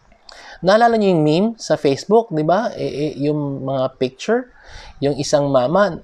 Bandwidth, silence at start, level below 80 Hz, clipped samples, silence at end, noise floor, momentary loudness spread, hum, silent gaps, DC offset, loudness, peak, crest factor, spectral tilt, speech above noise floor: 11 kHz; 0.35 s; -50 dBFS; under 0.1%; 0 s; -42 dBFS; 9 LU; none; none; under 0.1%; -18 LUFS; -2 dBFS; 16 dB; -6 dB/octave; 25 dB